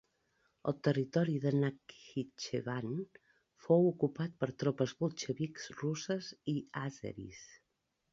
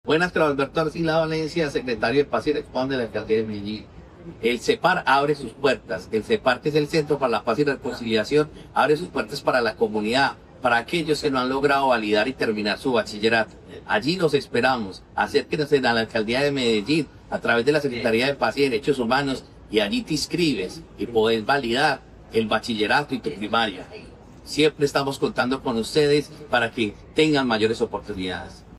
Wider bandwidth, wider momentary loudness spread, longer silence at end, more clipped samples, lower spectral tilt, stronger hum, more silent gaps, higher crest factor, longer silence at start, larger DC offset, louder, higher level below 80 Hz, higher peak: second, 7.6 kHz vs 13 kHz; first, 14 LU vs 8 LU; first, 0.55 s vs 0 s; neither; first, -6.5 dB/octave vs -5 dB/octave; neither; neither; about the same, 22 dB vs 18 dB; first, 0.65 s vs 0.05 s; neither; second, -36 LUFS vs -23 LUFS; second, -72 dBFS vs -50 dBFS; second, -16 dBFS vs -6 dBFS